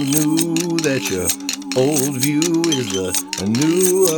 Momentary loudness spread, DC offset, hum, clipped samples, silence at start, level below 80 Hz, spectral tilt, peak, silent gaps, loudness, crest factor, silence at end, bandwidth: 5 LU; under 0.1%; none; under 0.1%; 0 s; -54 dBFS; -4 dB/octave; 0 dBFS; none; -18 LUFS; 16 dB; 0 s; over 20 kHz